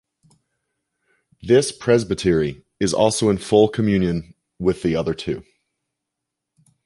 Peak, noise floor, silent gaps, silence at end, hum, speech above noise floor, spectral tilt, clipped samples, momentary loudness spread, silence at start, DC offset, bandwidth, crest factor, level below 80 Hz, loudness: -2 dBFS; -82 dBFS; none; 1.45 s; none; 63 dB; -5.5 dB/octave; under 0.1%; 10 LU; 1.45 s; under 0.1%; 11.5 kHz; 20 dB; -46 dBFS; -20 LUFS